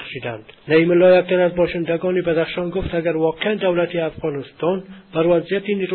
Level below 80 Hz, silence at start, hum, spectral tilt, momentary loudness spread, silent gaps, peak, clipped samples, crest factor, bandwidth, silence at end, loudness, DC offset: -46 dBFS; 0 s; none; -11.5 dB/octave; 13 LU; none; -4 dBFS; under 0.1%; 14 dB; 4.4 kHz; 0 s; -19 LUFS; under 0.1%